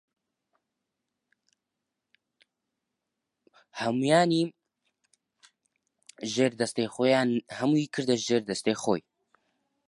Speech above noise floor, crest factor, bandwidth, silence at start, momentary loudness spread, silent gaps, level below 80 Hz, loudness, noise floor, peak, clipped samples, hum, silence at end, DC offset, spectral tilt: 59 dB; 22 dB; 11.5 kHz; 3.75 s; 10 LU; none; -74 dBFS; -27 LUFS; -85 dBFS; -8 dBFS; under 0.1%; none; 0.9 s; under 0.1%; -5 dB/octave